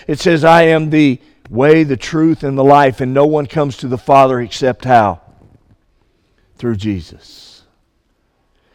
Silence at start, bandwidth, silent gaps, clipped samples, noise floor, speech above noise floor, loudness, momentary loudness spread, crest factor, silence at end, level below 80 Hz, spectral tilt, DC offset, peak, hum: 0.1 s; 12 kHz; none; 0.1%; -61 dBFS; 49 dB; -12 LUFS; 13 LU; 14 dB; 1.7 s; -46 dBFS; -6.5 dB/octave; under 0.1%; 0 dBFS; none